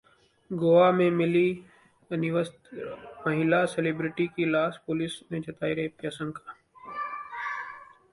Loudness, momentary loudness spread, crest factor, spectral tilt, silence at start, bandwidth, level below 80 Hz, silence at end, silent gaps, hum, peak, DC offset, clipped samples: -27 LUFS; 18 LU; 18 dB; -7 dB/octave; 0.5 s; 11.5 kHz; -66 dBFS; 0.3 s; none; none; -8 dBFS; under 0.1%; under 0.1%